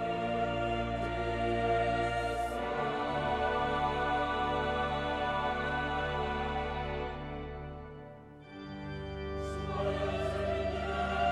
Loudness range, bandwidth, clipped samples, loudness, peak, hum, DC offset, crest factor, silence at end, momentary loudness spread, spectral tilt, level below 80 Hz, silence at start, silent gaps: 7 LU; 13 kHz; under 0.1%; -33 LUFS; -18 dBFS; none; under 0.1%; 14 dB; 0 s; 12 LU; -6 dB/octave; -46 dBFS; 0 s; none